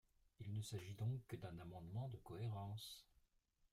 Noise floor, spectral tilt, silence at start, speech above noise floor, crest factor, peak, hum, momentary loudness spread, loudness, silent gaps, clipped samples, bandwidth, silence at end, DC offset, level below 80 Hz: -81 dBFS; -6 dB/octave; 0.4 s; 31 dB; 16 dB; -36 dBFS; none; 8 LU; -51 LUFS; none; under 0.1%; 15.5 kHz; 0.7 s; under 0.1%; -74 dBFS